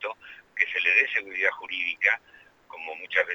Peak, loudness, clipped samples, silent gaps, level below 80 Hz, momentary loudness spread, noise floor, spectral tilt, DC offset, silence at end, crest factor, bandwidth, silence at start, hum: -6 dBFS; -24 LUFS; under 0.1%; none; -74 dBFS; 18 LU; -56 dBFS; -1 dB/octave; under 0.1%; 0 s; 22 dB; 19 kHz; 0 s; none